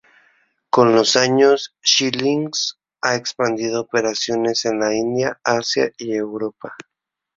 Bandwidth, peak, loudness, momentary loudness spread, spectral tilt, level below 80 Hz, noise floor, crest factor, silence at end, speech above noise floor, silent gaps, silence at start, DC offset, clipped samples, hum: 7.8 kHz; 0 dBFS; -18 LUFS; 10 LU; -3 dB/octave; -62 dBFS; -60 dBFS; 18 dB; 0.6 s; 42 dB; none; 0.75 s; under 0.1%; under 0.1%; none